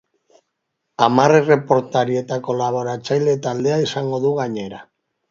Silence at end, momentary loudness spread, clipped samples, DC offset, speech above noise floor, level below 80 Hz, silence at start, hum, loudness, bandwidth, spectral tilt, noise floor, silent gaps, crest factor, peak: 0.45 s; 12 LU; under 0.1%; under 0.1%; 58 dB; -62 dBFS; 1 s; none; -18 LUFS; 7.6 kHz; -6 dB/octave; -75 dBFS; none; 18 dB; 0 dBFS